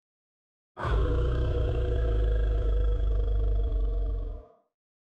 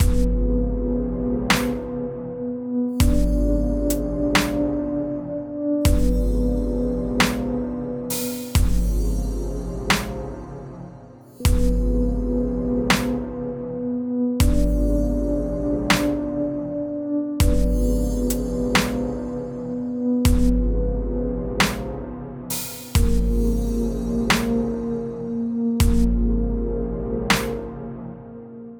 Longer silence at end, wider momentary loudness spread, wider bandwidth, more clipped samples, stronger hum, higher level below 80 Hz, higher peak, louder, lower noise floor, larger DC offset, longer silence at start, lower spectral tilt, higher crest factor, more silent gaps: first, 0.6 s vs 0 s; about the same, 7 LU vs 9 LU; second, 4.1 kHz vs over 20 kHz; neither; neither; about the same, -28 dBFS vs -26 dBFS; second, -16 dBFS vs -4 dBFS; second, -30 LUFS vs -23 LUFS; first, under -90 dBFS vs -43 dBFS; neither; first, 0.75 s vs 0 s; first, -8.5 dB/octave vs -5.5 dB/octave; second, 12 dB vs 18 dB; neither